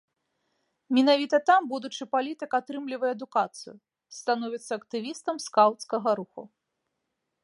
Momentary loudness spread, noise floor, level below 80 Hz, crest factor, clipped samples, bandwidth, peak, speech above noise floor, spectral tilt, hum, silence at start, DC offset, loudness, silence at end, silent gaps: 13 LU; -81 dBFS; -86 dBFS; 20 dB; under 0.1%; 11.5 kHz; -8 dBFS; 55 dB; -3.5 dB/octave; none; 0.9 s; under 0.1%; -27 LUFS; 0.95 s; none